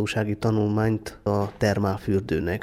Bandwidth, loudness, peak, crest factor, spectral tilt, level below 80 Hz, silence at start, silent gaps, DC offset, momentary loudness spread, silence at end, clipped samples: 14 kHz; -25 LUFS; -8 dBFS; 16 dB; -7 dB/octave; -46 dBFS; 0 s; none; under 0.1%; 4 LU; 0 s; under 0.1%